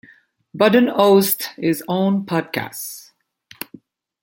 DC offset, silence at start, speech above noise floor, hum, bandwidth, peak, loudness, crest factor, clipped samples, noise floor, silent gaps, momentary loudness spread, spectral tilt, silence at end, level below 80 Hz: under 0.1%; 0.55 s; 35 dB; none; 17 kHz; -2 dBFS; -18 LUFS; 18 dB; under 0.1%; -52 dBFS; none; 21 LU; -5 dB/octave; 1.2 s; -64 dBFS